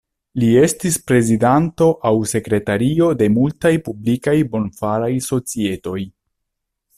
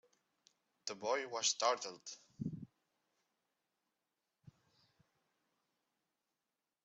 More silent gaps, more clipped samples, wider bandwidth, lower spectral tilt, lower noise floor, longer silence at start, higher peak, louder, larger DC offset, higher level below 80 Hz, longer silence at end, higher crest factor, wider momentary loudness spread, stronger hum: neither; neither; first, 15 kHz vs 8.2 kHz; first, -6 dB/octave vs -2 dB/octave; second, -77 dBFS vs under -90 dBFS; second, 0.35 s vs 0.85 s; first, -2 dBFS vs -20 dBFS; first, -17 LUFS vs -39 LUFS; neither; first, -48 dBFS vs -84 dBFS; second, 0.9 s vs 4.2 s; second, 14 dB vs 26 dB; second, 8 LU vs 18 LU; neither